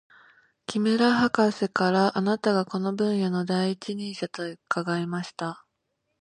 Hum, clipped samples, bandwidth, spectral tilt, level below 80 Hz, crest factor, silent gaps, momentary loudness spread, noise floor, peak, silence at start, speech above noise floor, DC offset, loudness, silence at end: none; under 0.1%; 10.5 kHz; -6 dB/octave; -68 dBFS; 20 dB; none; 12 LU; -78 dBFS; -6 dBFS; 0.7 s; 53 dB; under 0.1%; -26 LUFS; 0.65 s